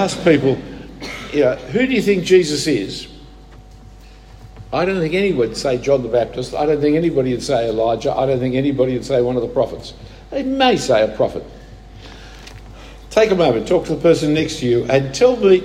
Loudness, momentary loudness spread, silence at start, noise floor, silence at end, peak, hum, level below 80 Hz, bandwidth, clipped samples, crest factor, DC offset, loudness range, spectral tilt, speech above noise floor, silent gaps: -17 LUFS; 17 LU; 0 s; -40 dBFS; 0 s; 0 dBFS; none; -40 dBFS; 13 kHz; under 0.1%; 16 dB; under 0.1%; 3 LU; -5.5 dB/octave; 24 dB; none